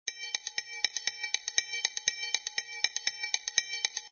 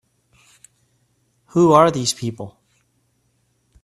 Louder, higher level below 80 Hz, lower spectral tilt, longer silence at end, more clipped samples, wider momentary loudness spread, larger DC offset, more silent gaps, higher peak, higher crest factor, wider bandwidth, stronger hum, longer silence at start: second, -31 LUFS vs -17 LUFS; second, -78 dBFS vs -58 dBFS; second, 4 dB/octave vs -5 dB/octave; second, 0.05 s vs 1.35 s; neither; second, 5 LU vs 22 LU; neither; neither; second, -8 dBFS vs 0 dBFS; about the same, 26 dB vs 22 dB; second, 7 kHz vs 12.5 kHz; neither; second, 0.05 s vs 1.55 s